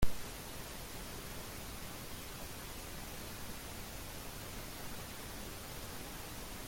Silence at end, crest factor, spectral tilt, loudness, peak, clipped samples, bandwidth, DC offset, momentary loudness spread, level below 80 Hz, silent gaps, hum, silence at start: 0 s; 24 dB; -3.5 dB/octave; -46 LUFS; -18 dBFS; under 0.1%; 17 kHz; under 0.1%; 0 LU; -50 dBFS; none; none; 0 s